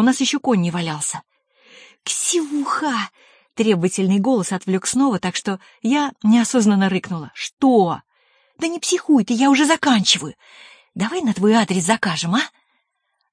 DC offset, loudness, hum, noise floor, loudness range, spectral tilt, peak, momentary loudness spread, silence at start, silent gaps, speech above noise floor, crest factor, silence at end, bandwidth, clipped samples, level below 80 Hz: under 0.1%; -18 LUFS; none; -72 dBFS; 4 LU; -4 dB/octave; -2 dBFS; 12 LU; 0 s; 7.53-7.57 s; 53 dB; 18 dB; 0.85 s; 10.5 kHz; under 0.1%; -64 dBFS